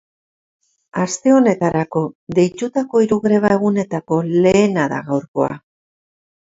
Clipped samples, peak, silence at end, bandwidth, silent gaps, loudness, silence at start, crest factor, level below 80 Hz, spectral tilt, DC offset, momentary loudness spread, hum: under 0.1%; 0 dBFS; 0.9 s; 8 kHz; 2.15-2.27 s, 5.28-5.34 s; -17 LUFS; 0.95 s; 16 dB; -54 dBFS; -6.5 dB/octave; under 0.1%; 9 LU; none